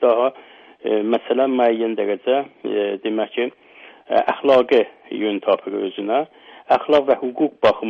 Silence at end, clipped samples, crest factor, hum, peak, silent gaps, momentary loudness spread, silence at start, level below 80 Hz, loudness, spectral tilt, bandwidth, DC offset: 0 s; under 0.1%; 16 dB; none; -2 dBFS; none; 9 LU; 0 s; -62 dBFS; -20 LUFS; -6.5 dB/octave; 7 kHz; under 0.1%